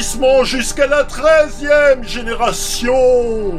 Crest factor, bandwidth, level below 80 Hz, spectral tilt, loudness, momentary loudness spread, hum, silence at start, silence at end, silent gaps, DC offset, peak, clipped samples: 12 dB; 15 kHz; -26 dBFS; -3 dB/octave; -14 LUFS; 6 LU; 50 Hz at -45 dBFS; 0 s; 0 s; none; under 0.1%; 0 dBFS; under 0.1%